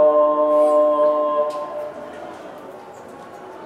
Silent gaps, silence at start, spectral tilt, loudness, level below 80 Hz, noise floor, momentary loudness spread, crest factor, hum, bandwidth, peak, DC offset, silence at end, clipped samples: none; 0 s; -5.5 dB/octave; -18 LUFS; -72 dBFS; -38 dBFS; 23 LU; 12 dB; none; 9.8 kHz; -6 dBFS; under 0.1%; 0 s; under 0.1%